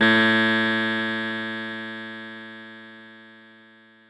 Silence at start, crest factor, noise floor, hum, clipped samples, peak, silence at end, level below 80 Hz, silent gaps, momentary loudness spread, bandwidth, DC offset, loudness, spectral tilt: 0 s; 18 dB; -52 dBFS; none; under 0.1%; -8 dBFS; 0.75 s; -68 dBFS; none; 24 LU; 11 kHz; under 0.1%; -22 LUFS; -5 dB/octave